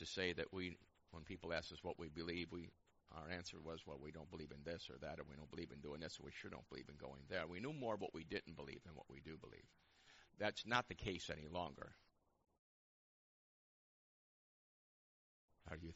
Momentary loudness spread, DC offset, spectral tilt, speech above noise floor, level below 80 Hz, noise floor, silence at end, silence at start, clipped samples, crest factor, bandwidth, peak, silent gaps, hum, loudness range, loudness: 15 LU; under 0.1%; -3 dB/octave; 20 dB; -70 dBFS; -70 dBFS; 0 s; 0 s; under 0.1%; 28 dB; 7.6 kHz; -22 dBFS; 12.59-15.48 s; none; 6 LU; -50 LUFS